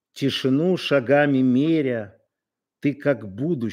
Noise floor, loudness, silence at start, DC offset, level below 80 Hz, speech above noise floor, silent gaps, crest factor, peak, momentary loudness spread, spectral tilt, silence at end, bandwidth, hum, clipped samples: -86 dBFS; -21 LUFS; 0.15 s; under 0.1%; -72 dBFS; 65 dB; none; 16 dB; -6 dBFS; 9 LU; -7 dB/octave; 0 s; 12.5 kHz; none; under 0.1%